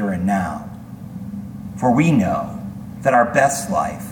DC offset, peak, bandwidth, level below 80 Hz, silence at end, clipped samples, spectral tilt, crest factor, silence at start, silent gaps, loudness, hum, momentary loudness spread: under 0.1%; -2 dBFS; 19 kHz; -46 dBFS; 0 s; under 0.1%; -6 dB/octave; 18 dB; 0 s; none; -18 LUFS; none; 17 LU